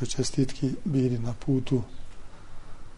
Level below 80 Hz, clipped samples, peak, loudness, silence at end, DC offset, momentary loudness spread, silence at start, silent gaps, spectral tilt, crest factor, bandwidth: -42 dBFS; under 0.1%; -12 dBFS; -28 LUFS; 0 s; under 0.1%; 4 LU; 0 s; none; -6.5 dB/octave; 16 dB; 10.5 kHz